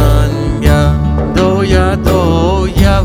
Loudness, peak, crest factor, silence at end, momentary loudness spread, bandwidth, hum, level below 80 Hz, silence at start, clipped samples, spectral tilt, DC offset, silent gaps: -11 LUFS; 0 dBFS; 10 dB; 0 s; 3 LU; 16 kHz; none; -16 dBFS; 0 s; 0.7%; -7 dB/octave; under 0.1%; none